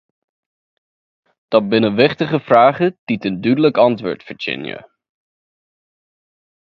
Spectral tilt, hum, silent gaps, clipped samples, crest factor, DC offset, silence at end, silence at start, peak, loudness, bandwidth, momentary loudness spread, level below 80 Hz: -8 dB/octave; none; 2.99-3.07 s; under 0.1%; 18 dB; under 0.1%; 1.95 s; 1.5 s; 0 dBFS; -16 LUFS; 6.4 kHz; 13 LU; -60 dBFS